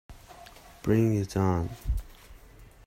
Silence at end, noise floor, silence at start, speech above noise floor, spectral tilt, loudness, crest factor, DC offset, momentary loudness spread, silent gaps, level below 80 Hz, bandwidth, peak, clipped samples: 0.25 s; -52 dBFS; 0.1 s; 26 dB; -7.5 dB/octave; -28 LUFS; 18 dB; under 0.1%; 24 LU; none; -40 dBFS; 16 kHz; -12 dBFS; under 0.1%